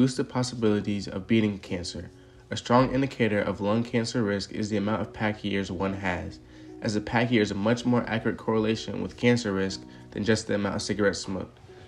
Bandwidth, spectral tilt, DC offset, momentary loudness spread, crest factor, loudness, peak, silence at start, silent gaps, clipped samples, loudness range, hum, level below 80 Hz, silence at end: 11.5 kHz; -5.5 dB/octave; under 0.1%; 11 LU; 18 dB; -27 LUFS; -8 dBFS; 0 s; none; under 0.1%; 2 LU; none; -54 dBFS; 0 s